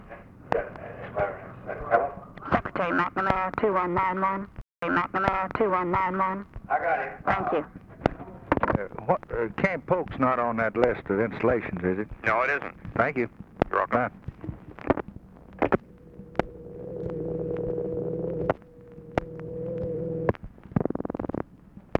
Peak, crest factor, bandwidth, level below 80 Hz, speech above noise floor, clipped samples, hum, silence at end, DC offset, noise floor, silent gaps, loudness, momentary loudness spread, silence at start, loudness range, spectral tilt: -4 dBFS; 24 dB; 7.8 kHz; -48 dBFS; 23 dB; under 0.1%; none; 0 s; under 0.1%; -50 dBFS; none; -28 LUFS; 14 LU; 0 s; 6 LU; -8.5 dB/octave